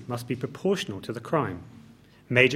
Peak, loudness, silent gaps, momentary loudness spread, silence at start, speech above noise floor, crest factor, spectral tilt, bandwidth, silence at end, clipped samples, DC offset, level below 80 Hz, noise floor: -2 dBFS; -28 LUFS; none; 12 LU; 0 s; 23 dB; 26 dB; -5.5 dB/octave; 15.5 kHz; 0 s; under 0.1%; under 0.1%; -64 dBFS; -53 dBFS